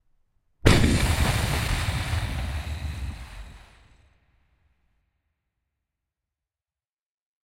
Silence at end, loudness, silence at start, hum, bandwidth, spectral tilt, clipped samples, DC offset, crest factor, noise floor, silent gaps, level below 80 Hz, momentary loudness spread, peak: 4 s; -25 LUFS; 0.65 s; none; 16 kHz; -5 dB/octave; under 0.1%; under 0.1%; 28 dB; under -90 dBFS; none; -34 dBFS; 17 LU; 0 dBFS